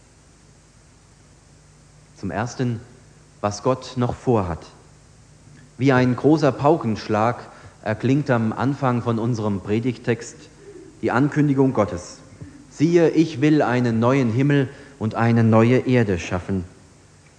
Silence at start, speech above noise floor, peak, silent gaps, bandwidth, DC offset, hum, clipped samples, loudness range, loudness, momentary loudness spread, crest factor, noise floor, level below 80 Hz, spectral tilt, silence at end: 2.2 s; 32 dB; -2 dBFS; none; 9.8 kHz; under 0.1%; none; under 0.1%; 8 LU; -20 LUFS; 12 LU; 18 dB; -51 dBFS; -52 dBFS; -7.5 dB/octave; 0.7 s